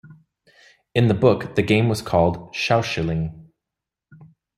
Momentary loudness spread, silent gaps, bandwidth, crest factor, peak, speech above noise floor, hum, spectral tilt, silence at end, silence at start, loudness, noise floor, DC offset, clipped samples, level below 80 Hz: 8 LU; none; 14 kHz; 20 dB; -2 dBFS; 66 dB; none; -6.5 dB/octave; 0.35 s; 0.05 s; -21 LUFS; -86 dBFS; under 0.1%; under 0.1%; -48 dBFS